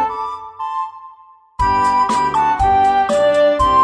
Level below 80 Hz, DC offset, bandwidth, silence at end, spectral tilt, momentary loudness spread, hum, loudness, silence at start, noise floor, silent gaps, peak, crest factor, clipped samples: -34 dBFS; under 0.1%; 10.5 kHz; 0 s; -5 dB/octave; 13 LU; none; -15 LUFS; 0 s; -45 dBFS; none; -4 dBFS; 12 dB; under 0.1%